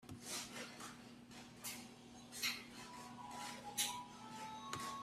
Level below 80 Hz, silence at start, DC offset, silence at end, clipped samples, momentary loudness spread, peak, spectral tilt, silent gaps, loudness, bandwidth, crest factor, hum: -78 dBFS; 0 s; under 0.1%; 0 s; under 0.1%; 16 LU; -26 dBFS; -1.5 dB/octave; none; -47 LUFS; 15.5 kHz; 22 dB; none